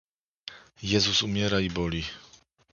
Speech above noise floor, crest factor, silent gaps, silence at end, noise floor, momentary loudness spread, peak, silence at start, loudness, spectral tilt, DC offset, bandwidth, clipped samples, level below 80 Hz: 21 dB; 22 dB; none; 0.5 s; -48 dBFS; 21 LU; -8 dBFS; 0.45 s; -26 LUFS; -4 dB/octave; under 0.1%; 7.4 kHz; under 0.1%; -48 dBFS